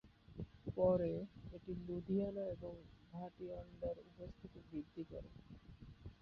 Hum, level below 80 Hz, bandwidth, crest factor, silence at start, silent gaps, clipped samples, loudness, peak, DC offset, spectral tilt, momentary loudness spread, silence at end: none; -62 dBFS; 5.8 kHz; 20 dB; 0.05 s; none; under 0.1%; -44 LUFS; -24 dBFS; under 0.1%; -9 dB/octave; 20 LU; 0.05 s